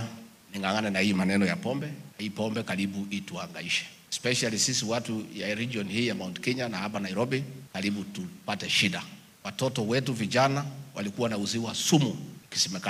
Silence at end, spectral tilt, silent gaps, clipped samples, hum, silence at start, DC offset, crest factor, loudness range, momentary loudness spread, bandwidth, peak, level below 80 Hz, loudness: 0 s; -4 dB/octave; none; under 0.1%; none; 0 s; under 0.1%; 20 dB; 3 LU; 13 LU; 15.5 kHz; -10 dBFS; -70 dBFS; -29 LUFS